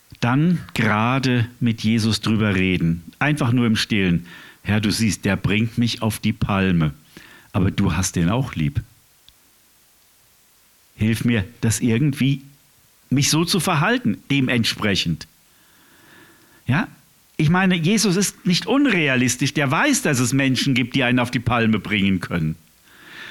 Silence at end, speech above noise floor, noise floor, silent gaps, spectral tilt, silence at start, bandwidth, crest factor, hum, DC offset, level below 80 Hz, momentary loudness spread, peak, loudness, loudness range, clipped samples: 0 s; 36 dB; -56 dBFS; none; -5 dB/octave; 0.2 s; 18.5 kHz; 16 dB; none; under 0.1%; -46 dBFS; 7 LU; -4 dBFS; -20 LUFS; 6 LU; under 0.1%